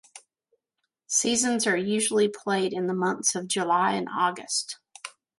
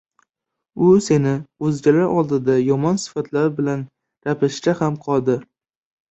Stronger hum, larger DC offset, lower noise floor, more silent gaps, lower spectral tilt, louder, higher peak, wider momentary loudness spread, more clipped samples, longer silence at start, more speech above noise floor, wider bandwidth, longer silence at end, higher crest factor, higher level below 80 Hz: neither; neither; about the same, -82 dBFS vs -82 dBFS; neither; second, -2.5 dB/octave vs -7 dB/octave; second, -25 LUFS vs -19 LUFS; second, -10 dBFS vs -2 dBFS; second, 6 LU vs 10 LU; neither; second, 0.15 s vs 0.75 s; second, 56 dB vs 64 dB; first, 11.5 kHz vs 8.2 kHz; second, 0.3 s vs 0.65 s; about the same, 18 dB vs 16 dB; second, -70 dBFS vs -58 dBFS